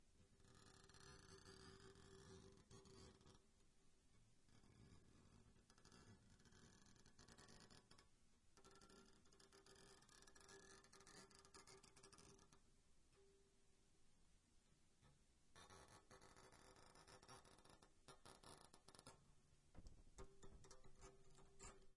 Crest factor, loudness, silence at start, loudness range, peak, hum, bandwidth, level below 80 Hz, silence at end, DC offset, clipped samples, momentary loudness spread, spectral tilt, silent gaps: 24 dB; -67 LUFS; 0 s; 2 LU; -44 dBFS; none; 12 kHz; -76 dBFS; 0 s; under 0.1%; under 0.1%; 4 LU; -3.5 dB/octave; none